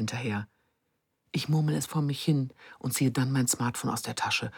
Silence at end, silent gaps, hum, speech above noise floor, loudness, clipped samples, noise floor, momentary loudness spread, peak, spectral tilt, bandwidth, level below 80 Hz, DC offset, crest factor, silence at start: 0 s; none; none; 49 dB; -29 LUFS; under 0.1%; -78 dBFS; 10 LU; -14 dBFS; -4.5 dB/octave; 19 kHz; -68 dBFS; under 0.1%; 16 dB; 0 s